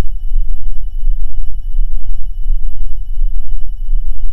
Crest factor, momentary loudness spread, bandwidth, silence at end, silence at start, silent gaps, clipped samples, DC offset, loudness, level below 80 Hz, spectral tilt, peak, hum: 6 dB; 4 LU; 0.2 kHz; 0 s; 0 s; none; 0.7%; under 0.1%; -25 LUFS; -14 dBFS; -7.5 dB/octave; 0 dBFS; none